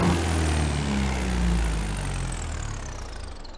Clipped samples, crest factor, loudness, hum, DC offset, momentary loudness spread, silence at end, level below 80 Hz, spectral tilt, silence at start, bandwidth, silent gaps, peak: under 0.1%; 14 dB; -27 LUFS; none; under 0.1%; 12 LU; 0 s; -30 dBFS; -5 dB/octave; 0 s; 11 kHz; none; -12 dBFS